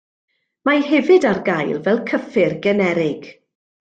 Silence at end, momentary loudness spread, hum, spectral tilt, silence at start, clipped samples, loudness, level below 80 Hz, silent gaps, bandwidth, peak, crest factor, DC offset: 0.65 s; 8 LU; none; -6.5 dB/octave; 0.65 s; under 0.1%; -17 LUFS; -62 dBFS; none; 8 kHz; -4 dBFS; 16 dB; under 0.1%